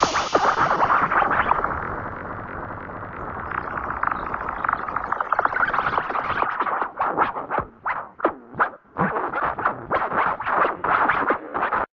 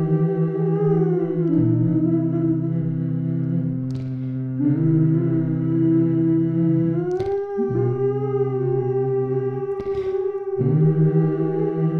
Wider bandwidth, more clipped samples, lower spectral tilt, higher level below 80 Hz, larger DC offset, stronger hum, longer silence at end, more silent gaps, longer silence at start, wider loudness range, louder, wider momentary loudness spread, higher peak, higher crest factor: first, 7.4 kHz vs 3.1 kHz; neither; second, -2.5 dB/octave vs -12 dB/octave; first, -46 dBFS vs -54 dBFS; neither; neither; about the same, 0.1 s vs 0 s; neither; about the same, 0 s vs 0 s; first, 5 LU vs 2 LU; about the same, -23 LUFS vs -21 LUFS; first, 12 LU vs 6 LU; first, -2 dBFS vs -8 dBFS; first, 20 dB vs 12 dB